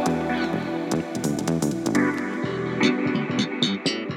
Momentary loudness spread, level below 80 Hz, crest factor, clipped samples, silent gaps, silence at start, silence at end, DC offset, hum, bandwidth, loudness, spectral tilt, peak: 5 LU; -56 dBFS; 18 dB; under 0.1%; none; 0 s; 0 s; under 0.1%; none; 17 kHz; -24 LUFS; -5 dB/octave; -6 dBFS